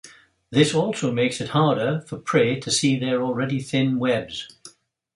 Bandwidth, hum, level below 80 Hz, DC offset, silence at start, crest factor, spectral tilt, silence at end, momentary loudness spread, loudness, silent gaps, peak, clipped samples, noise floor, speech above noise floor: 11.5 kHz; none; -60 dBFS; under 0.1%; 0.05 s; 20 dB; -5 dB/octave; 0.5 s; 6 LU; -22 LUFS; none; -4 dBFS; under 0.1%; -50 dBFS; 28 dB